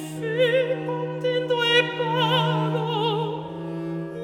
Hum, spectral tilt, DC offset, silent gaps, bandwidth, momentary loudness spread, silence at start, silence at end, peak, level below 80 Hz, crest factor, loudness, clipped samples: none; -5.5 dB/octave; under 0.1%; none; 15.5 kHz; 11 LU; 0 s; 0 s; -4 dBFS; -68 dBFS; 18 dB; -23 LUFS; under 0.1%